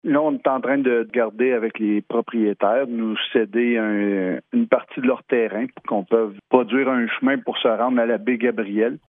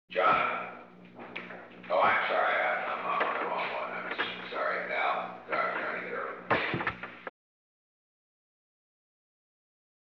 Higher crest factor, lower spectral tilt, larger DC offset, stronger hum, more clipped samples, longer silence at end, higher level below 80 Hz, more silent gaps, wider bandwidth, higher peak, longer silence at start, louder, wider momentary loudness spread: about the same, 18 dB vs 20 dB; first, -9.5 dB/octave vs -1.5 dB/octave; neither; second, none vs 60 Hz at -55 dBFS; neither; second, 0.1 s vs 2.9 s; second, -76 dBFS vs -70 dBFS; neither; second, 3.8 kHz vs 6.6 kHz; first, -2 dBFS vs -14 dBFS; about the same, 0.05 s vs 0.1 s; first, -21 LUFS vs -30 LUFS; second, 4 LU vs 17 LU